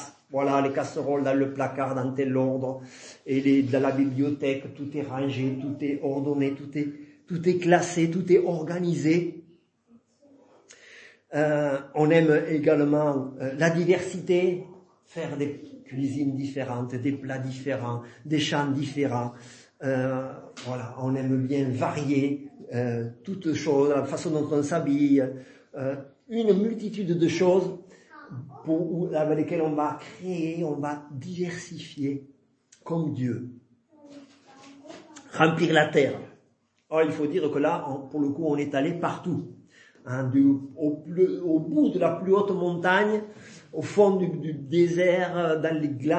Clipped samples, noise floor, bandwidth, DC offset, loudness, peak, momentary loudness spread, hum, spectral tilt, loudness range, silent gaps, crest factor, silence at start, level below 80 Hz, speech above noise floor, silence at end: under 0.1%; -67 dBFS; 8.8 kHz; under 0.1%; -26 LUFS; -4 dBFS; 14 LU; none; -6.5 dB/octave; 6 LU; none; 22 dB; 0 s; -72 dBFS; 42 dB; 0 s